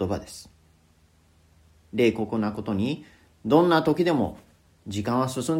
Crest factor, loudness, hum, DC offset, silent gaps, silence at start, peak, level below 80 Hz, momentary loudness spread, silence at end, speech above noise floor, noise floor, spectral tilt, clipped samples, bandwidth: 20 dB; -25 LUFS; none; under 0.1%; none; 0 s; -6 dBFS; -56 dBFS; 16 LU; 0 s; 36 dB; -60 dBFS; -6 dB/octave; under 0.1%; 16 kHz